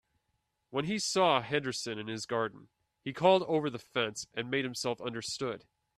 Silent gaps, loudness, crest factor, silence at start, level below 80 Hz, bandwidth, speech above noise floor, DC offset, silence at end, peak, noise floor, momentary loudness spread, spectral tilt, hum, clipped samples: none; -32 LUFS; 22 dB; 0.7 s; -72 dBFS; 13.5 kHz; 48 dB; under 0.1%; 0.4 s; -10 dBFS; -80 dBFS; 12 LU; -4 dB/octave; none; under 0.1%